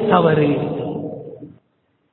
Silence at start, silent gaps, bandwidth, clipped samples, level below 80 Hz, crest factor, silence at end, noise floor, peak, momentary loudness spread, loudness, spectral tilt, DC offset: 0 s; none; 4.2 kHz; under 0.1%; -52 dBFS; 20 dB; 0.65 s; -65 dBFS; 0 dBFS; 22 LU; -18 LUFS; -11.5 dB/octave; under 0.1%